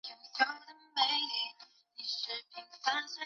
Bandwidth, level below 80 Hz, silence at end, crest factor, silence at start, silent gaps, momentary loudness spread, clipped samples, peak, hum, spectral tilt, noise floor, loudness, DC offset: 7.4 kHz; under -90 dBFS; 0 s; 22 dB; 0.05 s; none; 15 LU; under 0.1%; -14 dBFS; none; 5 dB/octave; -58 dBFS; -34 LUFS; under 0.1%